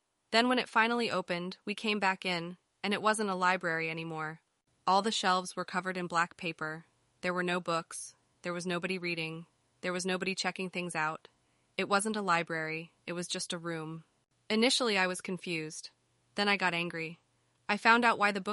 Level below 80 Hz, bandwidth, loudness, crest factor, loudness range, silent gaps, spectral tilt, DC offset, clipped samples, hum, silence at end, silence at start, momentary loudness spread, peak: -80 dBFS; 11.5 kHz; -32 LUFS; 24 dB; 4 LU; none; -3.5 dB/octave; under 0.1%; under 0.1%; none; 0 s; 0.3 s; 14 LU; -10 dBFS